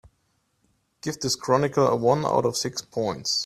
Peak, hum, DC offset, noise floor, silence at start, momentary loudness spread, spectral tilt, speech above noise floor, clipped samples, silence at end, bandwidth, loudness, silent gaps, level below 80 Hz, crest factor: -6 dBFS; none; under 0.1%; -70 dBFS; 1.05 s; 9 LU; -4 dB/octave; 47 dB; under 0.1%; 0 s; 15 kHz; -24 LUFS; none; -60 dBFS; 20 dB